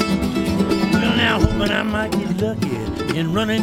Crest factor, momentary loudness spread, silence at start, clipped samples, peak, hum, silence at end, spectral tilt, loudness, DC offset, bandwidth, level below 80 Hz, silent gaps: 18 dB; 7 LU; 0 s; under 0.1%; 0 dBFS; none; 0 s; -5.5 dB/octave; -19 LUFS; under 0.1%; 16.5 kHz; -32 dBFS; none